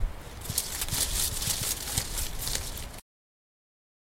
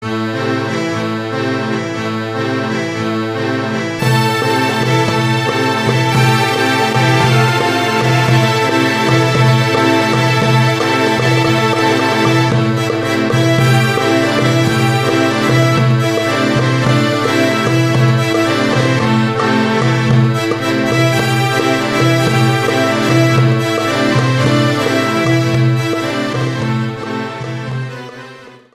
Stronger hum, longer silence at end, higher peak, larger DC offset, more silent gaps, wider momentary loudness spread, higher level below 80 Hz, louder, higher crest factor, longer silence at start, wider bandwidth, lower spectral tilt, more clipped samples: neither; first, 1 s vs 0.2 s; second, -8 dBFS vs 0 dBFS; neither; neither; first, 13 LU vs 6 LU; first, -38 dBFS vs -46 dBFS; second, -30 LUFS vs -13 LUFS; first, 24 dB vs 12 dB; about the same, 0 s vs 0 s; about the same, 17 kHz vs 15.5 kHz; second, -1.5 dB/octave vs -5.5 dB/octave; neither